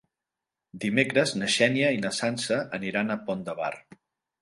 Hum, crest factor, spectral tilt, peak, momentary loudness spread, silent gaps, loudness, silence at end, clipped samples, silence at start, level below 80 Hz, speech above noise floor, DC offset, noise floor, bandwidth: none; 22 dB; -4 dB/octave; -6 dBFS; 10 LU; none; -26 LUFS; 0.6 s; under 0.1%; 0.75 s; -68 dBFS; 62 dB; under 0.1%; -88 dBFS; 11.5 kHz